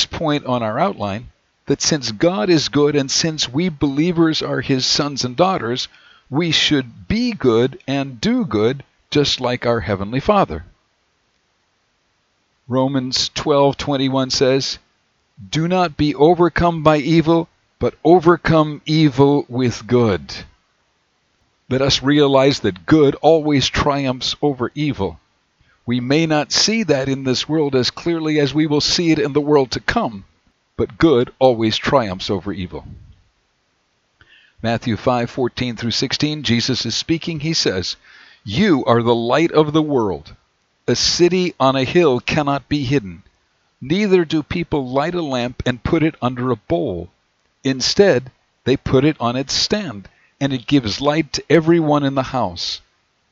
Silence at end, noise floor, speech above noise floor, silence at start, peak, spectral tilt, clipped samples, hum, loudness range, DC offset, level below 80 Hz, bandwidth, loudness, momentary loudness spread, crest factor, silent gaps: 0.55 s; -65 dBFS; 48 dB; 0 s; 0 dBFS; -5 dB/octave; under 0.1%; none; 5 LU; under 0.1%; -44 dBFS; 7.8 kHz; -17 LUFS; 10 LU; 18 dB; none